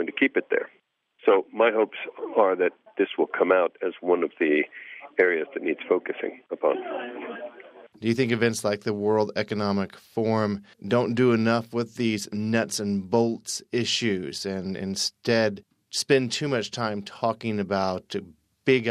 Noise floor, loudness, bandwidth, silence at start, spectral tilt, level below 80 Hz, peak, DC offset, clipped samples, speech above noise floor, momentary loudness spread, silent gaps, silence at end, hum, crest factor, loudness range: -65 dBFS; -25 LUFS; 14.5 kHz; 0 s; -5 dB/octave; -72 dBFS; -6 dBFS; under 0.1%; under 0.1%; 40 dB; 10 LU; none; 0 s; none; 20 dB; 3 LU